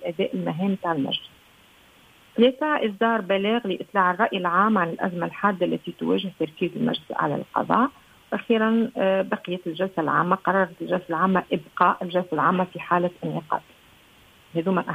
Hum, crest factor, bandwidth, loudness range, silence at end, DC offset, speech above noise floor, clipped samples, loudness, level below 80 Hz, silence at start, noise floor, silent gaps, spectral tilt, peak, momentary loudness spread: none; 22 dB; 15.5 kHz; 3 LU; 0 s; under 0.1%; 31 dB; under 0.1%; -24 LUFS; -66 dBFS; 0 s; -54 dBFS; none; -7.5 dB/octave; -2 dBFS; 8 LU